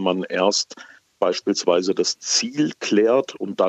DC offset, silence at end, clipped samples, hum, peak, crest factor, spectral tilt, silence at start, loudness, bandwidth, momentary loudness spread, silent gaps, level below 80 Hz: under 0.1%; 0 s; under 0.1%; none; -4 dBFS; 18 dB; -3 dB/octave; 0 s; -21 LUFS; 8.4 kHz; 5 LU; none; -76 dBFS